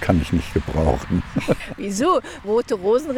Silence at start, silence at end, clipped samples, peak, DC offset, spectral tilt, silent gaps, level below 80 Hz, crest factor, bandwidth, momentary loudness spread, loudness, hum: 0 s; 0 s; under 0.1%; -2 dBFS; under 0.1%; -6.5 dB/octave; none; -34 dBFS; 18 dB; 17 kHz; 4 LU; -22 LUFS; none